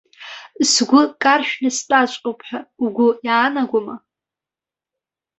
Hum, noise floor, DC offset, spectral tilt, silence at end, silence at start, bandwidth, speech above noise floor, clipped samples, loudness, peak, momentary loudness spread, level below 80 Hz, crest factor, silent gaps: none; -89 dBFS; under 0.1%; -2 dB/octave; 1.4 s; 0.2 s; 8.4 kHz; 71 dB; under 0.1%; -17 LUFS; -2 dBFS; 19 LU; -68 dBFS; 18 dB; none